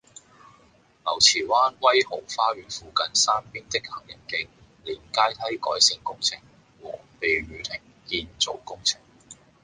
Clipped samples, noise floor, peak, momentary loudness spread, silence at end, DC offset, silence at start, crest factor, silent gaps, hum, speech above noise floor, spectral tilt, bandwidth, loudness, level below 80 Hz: under 0.1%; -58 dBFS; -4 dBFS; 18 LU; 0.3 s; under 0.1%; 1.05 s; 24 dB; none; none; 33 dB; -0.5 dB/octave; 10.5 kHz; -23 LUFS; -58 dBFS